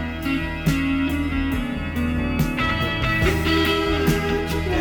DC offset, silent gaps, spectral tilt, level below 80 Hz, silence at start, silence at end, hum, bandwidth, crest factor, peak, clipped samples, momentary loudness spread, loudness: 0.3%; none; -6 dB/octave; -30 dBFS; 0 s; 0 s; none; over 20 kHz; 16 dB; -6 dBFS; under 0.1%; 5 LU; -22 LUFS